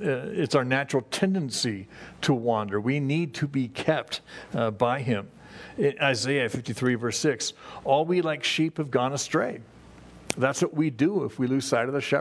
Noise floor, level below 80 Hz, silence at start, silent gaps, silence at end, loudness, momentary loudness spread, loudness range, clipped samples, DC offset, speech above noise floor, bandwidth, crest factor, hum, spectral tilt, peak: -48 dBFS; -62 dBFS; 0 s; none; 0 s; -26 LUFS; 8 LU; 2 LU; under 0.1%; under 0.1%; 22 dB; 11 kHz; 22 dB; none; -5 dB/octave; -4 dBFS